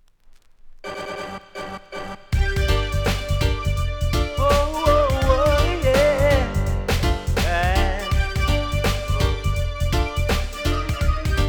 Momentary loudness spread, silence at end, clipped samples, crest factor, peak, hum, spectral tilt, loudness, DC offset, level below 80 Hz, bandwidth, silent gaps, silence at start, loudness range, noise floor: 14 LU; 0 s; under 0.1%; 18 dB; -2 dBFS; none; -5.5 dB/octave; -21 LUFS; under 0.1%; -24 dBFS; over 20 kHz; none; 0.65 s; 6 LU; -49 dBFS